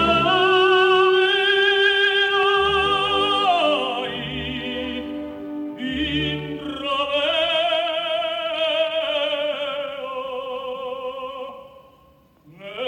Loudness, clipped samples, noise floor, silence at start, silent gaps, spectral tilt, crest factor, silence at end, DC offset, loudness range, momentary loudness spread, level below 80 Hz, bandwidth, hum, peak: -20 LUFS; under 0.1%; -54 dBFS; 0 s; none; -4.5 dB/octave; 16 dB; 0 s; under 0.1%; 10 LU; 14 LU; -48 dBFS; 10 kHz; none; -6 dBFS